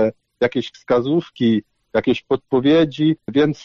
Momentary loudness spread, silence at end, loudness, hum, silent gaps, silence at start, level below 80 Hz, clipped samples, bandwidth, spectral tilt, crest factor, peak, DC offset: 7 LU; 0.1 s; -19 LUFS; none; none; 0 s; -52 dBFS; under 0.1%; 7 kHz; -7.5 dB/octave; 12 dB; -6 dBFS; under 0.1%